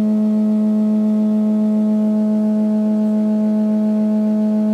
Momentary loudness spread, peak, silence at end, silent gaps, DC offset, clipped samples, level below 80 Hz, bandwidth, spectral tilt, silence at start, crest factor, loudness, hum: 1 LU; -10 dBFS; 0 s; none; under 0.1%; under 0.1%; -70 dBFS; 4.5 kHz; -10 dB/octave; 0 s; 6 dB; -16 LUFS; none